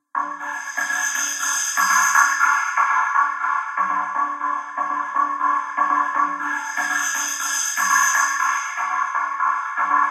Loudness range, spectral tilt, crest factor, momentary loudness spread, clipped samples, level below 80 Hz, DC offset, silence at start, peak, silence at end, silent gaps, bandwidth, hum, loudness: 3 LU; 1.5 dB/octave; 20 dB; 8 LU; under 0.1%; -88 dBFS; under 0.1%; 0.15 s; 0 dBFS; 0 s; none; 14 kHz; none; -20 LUFS